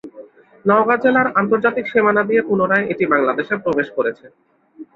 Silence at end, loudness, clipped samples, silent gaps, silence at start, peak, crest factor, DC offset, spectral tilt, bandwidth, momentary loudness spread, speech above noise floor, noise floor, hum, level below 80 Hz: 0.1 s; -17 LUFS; under 0.1%; none; 0.05 s; -2 dBFS; 16 dB; under 0.1%; -8.5 dB/octave; 5.2 kHz; 6 LU; 25 dB; -42 dBFS; none; -60 dBFS